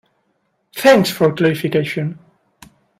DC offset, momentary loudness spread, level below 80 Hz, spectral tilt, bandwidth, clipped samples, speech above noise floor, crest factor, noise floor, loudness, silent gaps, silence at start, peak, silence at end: under 0.1%; 13 LU; -58 dBFS; -5.5 dB/octave; 16 kHz; under 0.1%; 52 dB; 18 dB; -66 dBFS; -16 LUFS; none; 0.75 s; 0 dBFS; 0.85 s